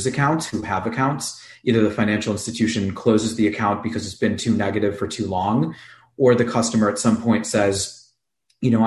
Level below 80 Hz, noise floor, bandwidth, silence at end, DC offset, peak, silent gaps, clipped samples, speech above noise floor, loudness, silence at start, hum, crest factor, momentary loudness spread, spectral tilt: -48 dBFS; -69 dBFS; 12.5 kHz; 0 s; under 0.1%; -4 dBFS; none; under 0.1%; 48 dB; -21 LUFS; 0 s; none; 16 dB; 7 LU; -5.5 dB/octave